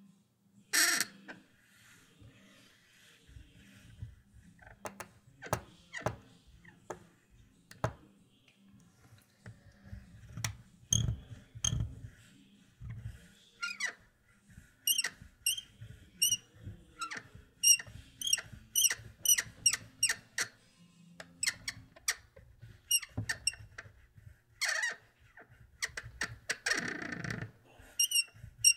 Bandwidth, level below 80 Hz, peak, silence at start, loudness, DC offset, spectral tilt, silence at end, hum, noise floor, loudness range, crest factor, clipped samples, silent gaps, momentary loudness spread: 16 kHz; -58 dBFS; -10 dBFS; 0.75 s; -33 LUFS; under 0.1%; -0.5 dB/octave; 0 s; none; -67 dBFS; 17 LU; 28 dB; under 0.1%; none; 24 LU